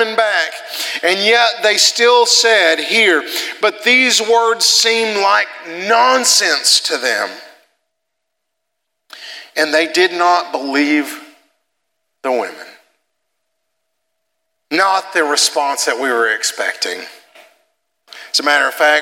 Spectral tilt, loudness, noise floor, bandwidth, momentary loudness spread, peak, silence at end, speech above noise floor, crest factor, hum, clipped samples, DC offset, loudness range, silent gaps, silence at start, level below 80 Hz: 0 dB/octave; -13 LUFS; -75 dBFS; 17 kHz; 12 LU; 0 dBFS; 0 s; 62 dB; 16 dB; none; under 0.1%; under 0.1%; 10 LU; none; 0 s; -80 dBFS